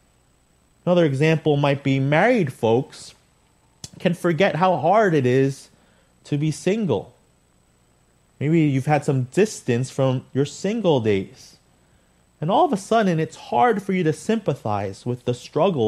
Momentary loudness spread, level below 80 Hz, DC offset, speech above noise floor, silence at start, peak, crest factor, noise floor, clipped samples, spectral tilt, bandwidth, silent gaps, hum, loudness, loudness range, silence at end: 9 LU; -60 dBFS; under 0.1%; 40 dB; 0.85 s; -2 dBFS; 18 dB; -60 dBFS; under 0.1%; -6.5 dB/octave; 13 kHz; none; none; -21 LUFS; 3 LU; 0 s